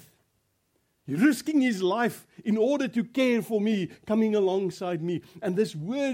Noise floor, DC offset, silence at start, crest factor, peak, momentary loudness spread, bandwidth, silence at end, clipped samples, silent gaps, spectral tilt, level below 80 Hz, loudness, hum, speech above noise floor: -73 dBFS; under 0.1%; 1.05 s; 16 dB; -10 dBFS; 7 LU; 16.5 kHz; 0 s; under 0.1%; none; -6 dB/octave; -72 dBFS; -27 LUFS; none; 47 dB